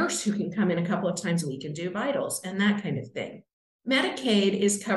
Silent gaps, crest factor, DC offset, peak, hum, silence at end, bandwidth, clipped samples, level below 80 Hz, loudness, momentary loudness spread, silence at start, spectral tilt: 3.53-3.79 s; 18 dB; under 0.1%; -10 dBFS; none; 0 s; 12 kHz; under 0.1%; -72 dBFS; -27 LUFS; 10 LU; 0 s; -4.5 dB/octave